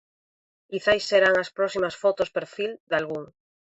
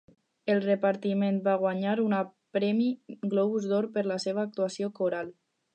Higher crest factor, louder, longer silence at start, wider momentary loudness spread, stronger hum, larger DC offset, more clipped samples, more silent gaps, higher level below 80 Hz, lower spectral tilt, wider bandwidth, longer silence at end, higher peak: about the same, 20 dB vs 16 dB; first, -24 LUFS vs -29 LUFS; first, 0.7 s vs 0.45 s; first, 13 LU vs 5 LU; neither; neither; neither; first, 2.80-2.87 s vs none; first, -62 dBFS vs -82 dBFS; second, -4 dB/octave vs -6.5 dB/octave; about the same, 8.2 kHz vs 9 kHz; about the same, 0.5 s vs 0.45 s; first, -6 dBFS vs -14 dBFS